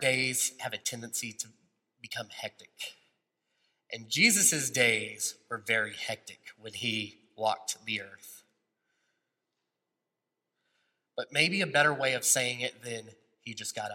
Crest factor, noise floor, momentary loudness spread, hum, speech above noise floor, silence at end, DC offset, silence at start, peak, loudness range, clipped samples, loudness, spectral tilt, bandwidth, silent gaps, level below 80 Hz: 24 dB; -87 dBFS; 19 LU; none; 55 dB; 0 s; under 0.1%; 0 s; -10 dBFS; 12 LU; under 0.1%; -28 LUFS; -1.5 dB/octave; 16.5 kHz; none; -80 dBFS